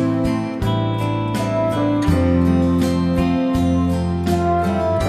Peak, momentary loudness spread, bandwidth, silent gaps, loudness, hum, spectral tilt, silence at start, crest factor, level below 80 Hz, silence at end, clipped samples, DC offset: -4 dBFS; 5 LU; 14 kHz; none; -18 LUFS; none; -7.5 dB/octave; 0 s; 12 dB; -34 dBFS; 0 s; under 0.1%; under 0.1%